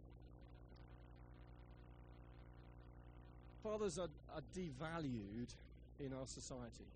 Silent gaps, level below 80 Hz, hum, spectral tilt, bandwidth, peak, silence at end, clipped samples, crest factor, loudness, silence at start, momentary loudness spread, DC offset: none; -62 dBFS; 60 Hz at -60 dBFS; -5.5 dB/octave; 9.4 kHz; -34 dBFS; 0 s; under 0.1%; 18 dB; -49 LUFS; 0 s; 17 LU; under 0.1%